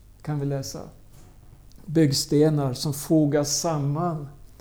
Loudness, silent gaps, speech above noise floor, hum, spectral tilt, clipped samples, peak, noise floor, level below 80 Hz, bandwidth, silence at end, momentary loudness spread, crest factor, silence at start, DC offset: -24 LUFS; none; 25 dB; none; -5.5 dB/octave; under 0.1%; -8 dBFS; -48 dBFS; -50 dBFS; over 20 kHz; 0.15 s; 13 LU; 16 dB; 0.25 s; under 0.1%